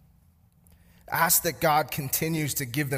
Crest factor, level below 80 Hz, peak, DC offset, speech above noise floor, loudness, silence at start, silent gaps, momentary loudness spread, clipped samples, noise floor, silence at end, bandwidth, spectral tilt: 20 dB; -56 dBFS; -8 dBFS; under 0.1%; 35 dB; -25 LUFS; 1.1 s; none; 7 LU; under 0.1%; -60 dBFS; 0 s; 15.5 kHz; -3.5 dB/octave